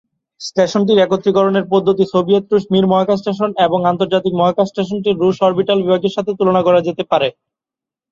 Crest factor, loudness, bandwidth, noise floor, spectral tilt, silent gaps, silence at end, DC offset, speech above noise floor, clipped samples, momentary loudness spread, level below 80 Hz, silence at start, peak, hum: 14 dB; -15 LUFS; 7.6 kHz; -88 dBFS; -6.5 dB/octave; none; 0.8 s; under 0.1%; 73 dB; under 0.1%; 5 LU; -56 dBFS; 0.4 s; -2 dBFS; none